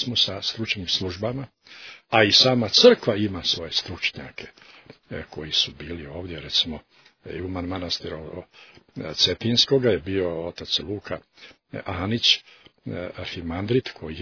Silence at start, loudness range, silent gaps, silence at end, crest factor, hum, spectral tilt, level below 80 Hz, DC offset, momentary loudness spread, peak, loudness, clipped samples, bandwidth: 0 s; 8 LU; none; 0 s; 24 dB; none; -4 dB/octave; -52 dBFS; under 0.1%; 22 LU; -2 dBFS; -21 LUFS; under 0.1%; 5.4 kHz